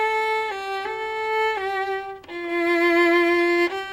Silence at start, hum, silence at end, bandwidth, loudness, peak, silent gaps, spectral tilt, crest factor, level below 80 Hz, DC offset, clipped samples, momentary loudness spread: 0 s; none; 0 s; 15 kHz; -22 LUFS; -8 dBFS; none; -3.5 dB/octave; 14 dB; -60 dBFS; under 0.1%; under 0.1%; 10 LU